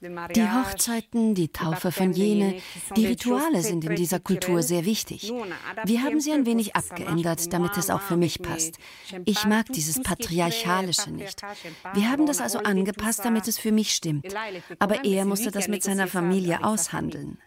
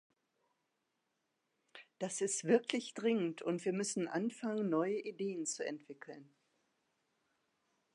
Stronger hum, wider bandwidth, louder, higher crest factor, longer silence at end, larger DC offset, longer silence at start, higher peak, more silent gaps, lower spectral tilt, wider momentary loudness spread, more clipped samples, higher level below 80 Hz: neither; first, 16 kHz vs 11.5 kHz; first, -25 LUFS vs -37 LUFS; about the same, 18 dB vs 22 dB; second, 0.1 s vs 1.7 s; neither; second, 0 s vs 1.75 s; first, -6 dBFS vs -18 dBFS; neither; about the same, -4 dB/octave vs -4 dB/octave; second, 8 LU vs 15 LU; neither; first, -54 dBFS vs under -90 dBFS